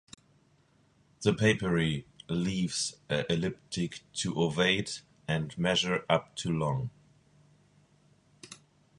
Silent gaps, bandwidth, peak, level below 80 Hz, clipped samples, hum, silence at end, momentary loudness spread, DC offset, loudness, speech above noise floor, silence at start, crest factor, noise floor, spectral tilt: none; 11.5 kHz; -8 dBFS; -58 dBFS; under 0.1%; none; 0.45 s; 12 LU; under 0.1%; -30 LUFS; 36 dB; 1.2 s; 24 dB; -66 dBFS; -4.5 dB/octave